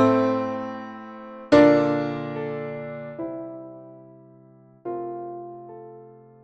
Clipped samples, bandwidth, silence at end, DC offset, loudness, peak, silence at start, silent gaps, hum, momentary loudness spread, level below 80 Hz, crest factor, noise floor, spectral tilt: under 0.1%; 8.2 kHz; 0.3 s; under 0.1%; -23 LUFS; -2 dBFS; 0 s; none; none; 24 LU; -58 dBFS; 22 dB; -52 dBFS; -7.5 dB/octave